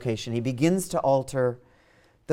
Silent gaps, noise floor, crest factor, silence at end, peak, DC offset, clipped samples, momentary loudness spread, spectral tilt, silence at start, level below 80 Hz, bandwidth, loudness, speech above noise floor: none; -60 dBFS; 18 dB; 0 s; -10 dBFS; under 0.1%; under 0.1%; 5 LU; -6 dB/octave; 0 s; -56 dBFS; 16.5 kHz; -26 LUFS; 35 dB